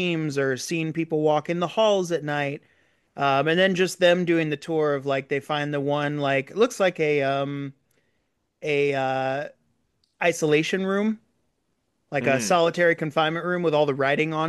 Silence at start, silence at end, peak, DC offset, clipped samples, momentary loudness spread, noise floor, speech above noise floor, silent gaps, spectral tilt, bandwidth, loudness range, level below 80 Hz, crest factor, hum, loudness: 0 s; 0 s; -8 dBFS; under 0.1%; under 0.1%; 7 LU; -74 dBFS; 51 dB; none; -5 dB/octave; 12.5 kHz; 4 LU; -72 dBFS; 16 dB; none; -23 LUFS